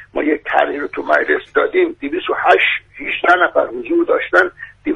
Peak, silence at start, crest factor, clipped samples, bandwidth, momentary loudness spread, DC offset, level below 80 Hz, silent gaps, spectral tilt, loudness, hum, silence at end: 0 dBFS; 0 s; 16 dB; under 0.1%; 9.2 kHz; 9 LU; under 0.1%; -52 dBFS; none; -4.5 dB/octave; -16 LUFS; none; 0 s